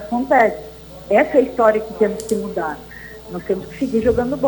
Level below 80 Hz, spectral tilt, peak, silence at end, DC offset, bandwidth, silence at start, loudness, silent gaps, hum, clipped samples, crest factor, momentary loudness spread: -44 dBFS; -6 dB/octave; -2 dBFS; 0 s; under 0.1%; over 20 kHz; 0 s; -18 LUFS; none; none; under 0.1%; 16 dB; 18 LU